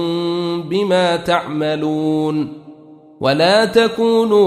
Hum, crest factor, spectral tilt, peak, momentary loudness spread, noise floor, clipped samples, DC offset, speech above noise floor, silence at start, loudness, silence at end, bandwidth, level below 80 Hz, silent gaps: none; 14 dB; -5.5 dB/octave; -2 dBFS; 8 LU; -41 dBFS; under 0.1%; under 0.1%; 26 dB; 0 s; -16 LUFS; 0 s; 14 kHz; -56 dBFS; none